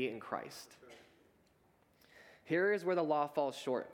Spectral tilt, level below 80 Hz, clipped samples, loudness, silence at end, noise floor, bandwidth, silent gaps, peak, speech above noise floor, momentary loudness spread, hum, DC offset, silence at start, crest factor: -5.5 dB/octave; -84 dBFS; under 0.1%; -36 LUFS; 0 s; -71 dBFS; 18 kHz; none; -20 dBFS; 35 dB; 19 LU; none; under 0.1%; 0 s; 18 dB